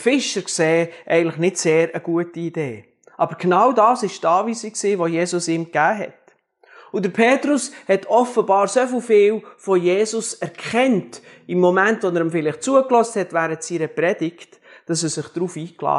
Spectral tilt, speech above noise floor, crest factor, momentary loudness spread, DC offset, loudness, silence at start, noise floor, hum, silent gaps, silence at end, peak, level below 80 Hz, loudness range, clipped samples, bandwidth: -4.5 dB/octave; 36 dB; 18 dB; 11 LU; under 0.1%; -19 LUFS; 0 s; -55 dBFS; none; none; 0 s; -2 dBFS; -76 dBFS; 3 LU; under 0.1%; 11.5 kHz